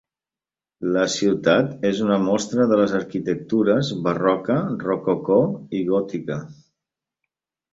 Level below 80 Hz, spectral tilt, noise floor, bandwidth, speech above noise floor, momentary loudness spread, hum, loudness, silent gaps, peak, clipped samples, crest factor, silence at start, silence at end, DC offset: -60 dBFS; -6 dB/octave; under -90 dBFS; 7.8 kHz; over 70 dB; 8 LU; none; -21 LUFS; none; -2 dBFS; under 0.1%; 20 dB; 0.8 s; 1.2 s; under 0.1%